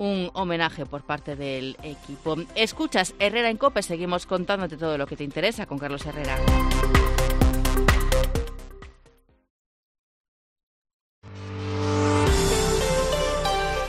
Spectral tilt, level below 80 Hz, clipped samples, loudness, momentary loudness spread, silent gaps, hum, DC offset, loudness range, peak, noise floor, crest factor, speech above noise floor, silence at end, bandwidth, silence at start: -4.5 dB/octave; -30 dBFS; under 0.1%; -25 LUFS; 11 LU; 9.50-10.56 s, 10.63-10.85 s, 10.94-11.22 s; none; under 0.1%; 8 LU; -6 dBFS; -58 dBFS; 20 dB; 33 dB; 0 s; 15.5 kHz; 0 s